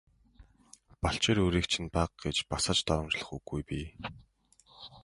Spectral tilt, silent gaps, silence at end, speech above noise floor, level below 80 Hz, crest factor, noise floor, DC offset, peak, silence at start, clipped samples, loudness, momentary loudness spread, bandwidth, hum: -4 dB/octave; none; 0.05 s; 32 dB; -46 dBFS; 20 dB; -64 dBFS; under 0.1%; -12 dBFS; 0.4 s; under 0.1%; -31 LUFS; 16 LU; 11.5 kHz; none